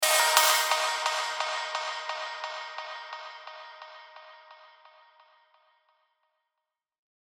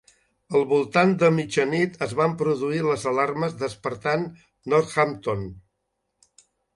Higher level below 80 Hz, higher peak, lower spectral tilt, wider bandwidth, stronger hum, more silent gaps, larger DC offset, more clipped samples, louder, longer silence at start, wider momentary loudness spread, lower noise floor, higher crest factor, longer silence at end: second, under -90 dBFS vs -58 dBFS; about the same, -4 dBFS vs -4 dBFS; second, 4.5 dB/octave vs -6 dB/octave; first, over 20 kHz vs 11.5 kHz; neither; neither; neither; neither; second, -26 LUFS vs -23 LUFS; second, 0 s vs 0.5 s; first, 25 LU vs 9 LU; first, -87 dBFS vs -77 dBFS; first, 28 dB vs 20 dB; first, 2.65 s vs 1.15 s